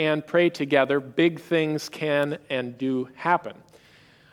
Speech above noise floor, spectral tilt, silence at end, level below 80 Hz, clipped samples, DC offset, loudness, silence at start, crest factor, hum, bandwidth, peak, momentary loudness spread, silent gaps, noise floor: 31 dB; -6 dB/octave; 0.8 s; -72 dBFS; under 0.1%; under 0.1%; -24 LUFS; 0 s; 20 dB; none; 16 kHz; -4 dBFS; 7 LU; none; -55 dBFS